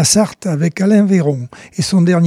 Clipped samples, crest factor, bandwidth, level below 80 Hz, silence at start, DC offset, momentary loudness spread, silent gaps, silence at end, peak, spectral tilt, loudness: under 0.1%; 14 dB; 14.5 kHz; -50 dBFS; 0 s; under 0.1%; 10 LU; none; 0 s; 0 dBFS; -5 dB/octave; -14 LUFS